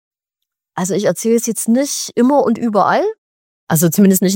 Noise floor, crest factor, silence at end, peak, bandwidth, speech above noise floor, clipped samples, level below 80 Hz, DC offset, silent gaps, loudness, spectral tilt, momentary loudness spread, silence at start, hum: -80 dBFS; 14 dB; 0 s; -2 dBFS; 17 kHz; 66 dB; under 0.1%; -62 dBFS; under 0.1%; 3.18-3.67 s; -15 LUFS; -5 dB/octave; 8 LU; 0.75 s; none